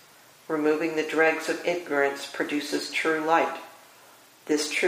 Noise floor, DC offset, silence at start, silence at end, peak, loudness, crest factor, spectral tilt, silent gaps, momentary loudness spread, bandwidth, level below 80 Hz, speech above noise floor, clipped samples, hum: -53 dBFS; under 0.1%; 0.5 s; 0 s; -8 dBFS; -26 LUFS; 20 dB; -3 dB/octave; none; 9 LU; 15.5 kHz; -82 dBFS; 28 dB; under 0.1%; none